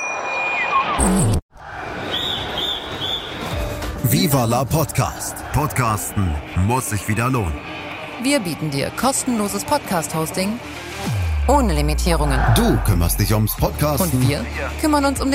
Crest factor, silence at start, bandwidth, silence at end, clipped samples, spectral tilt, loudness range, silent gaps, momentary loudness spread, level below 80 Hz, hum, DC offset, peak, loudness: 16 dB; 0 s; 16.5 kHz; 0 s; under 0.1%; -4.5 dB/octave; 3 LU; 1.42-1.49 s; 9 LU; -28 dBFS; none; under 0.1%; -4 dBFS; -20 LUFS